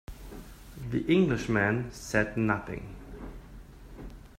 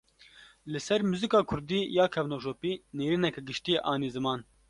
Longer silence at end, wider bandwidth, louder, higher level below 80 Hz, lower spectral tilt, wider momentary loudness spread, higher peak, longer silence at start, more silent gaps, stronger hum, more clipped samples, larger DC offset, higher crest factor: second, 0 s vs 0.25 s; first, 16 kHz vs 11.5 kHz; about the same, -28 LUFS vs -30 LUFS; first, -48 dBFS vs -60 dBFS; about the same, -6.5 dB/octave vs -5.5 dB/octave; first, 23 LU vs 9 LU; about the same, -10 dBFS vs -10 dBFS; second, 0.1 s vs 0.4 s; neither; neither; neither; neither; about the same, 22 dB vs 20 dB